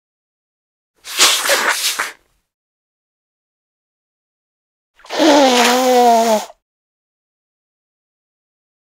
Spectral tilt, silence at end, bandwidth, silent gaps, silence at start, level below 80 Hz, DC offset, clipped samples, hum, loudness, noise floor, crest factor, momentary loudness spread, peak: -0.5 dB/octave; 2.4 s; 16.5 kHz; 2.54-4.94 s; 1.05 s; -66 dBFS; under 0.1%; under 0.1%; none; -12 LUFS; -35 dBFS; 18 dB; 15 LU; 0 dBFS